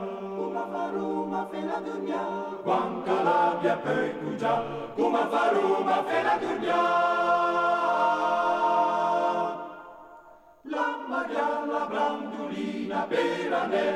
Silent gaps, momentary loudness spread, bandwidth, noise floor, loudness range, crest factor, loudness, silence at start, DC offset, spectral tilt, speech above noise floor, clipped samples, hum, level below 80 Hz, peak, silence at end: none; 9 LU; 12 kHz; -52 dBFS; 6 LU; 14 dB; -27 LUFS; 0 s; under 0.1%; -5.5 dB/octave; 26 dB; under 0.1%; none; -72 dBFS; -12 dBFS; 0 s